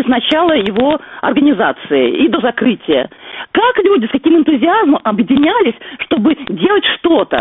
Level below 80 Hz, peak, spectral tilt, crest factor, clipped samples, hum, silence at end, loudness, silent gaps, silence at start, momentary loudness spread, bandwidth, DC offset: -48 dBFS; 0 dBFS; -2.5 dB/octave; 12 dB; under 0.1%; none; 0 s; -12 LUFS; none; 0 s; 5 LU; 4 kHz; under 0.1%